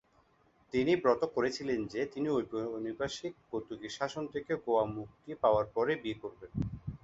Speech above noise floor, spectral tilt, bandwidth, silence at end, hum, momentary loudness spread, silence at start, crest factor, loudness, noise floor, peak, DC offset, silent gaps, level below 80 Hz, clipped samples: 35 dB; -6 dB/octave; 8 kHz; 0.05 s; none; 12 LU; 0.75 s; 22 dB; -34 LUFS; -68 dBFS; -12 dBFS; under 0.1%; none; -58 dBFS; under 0.1%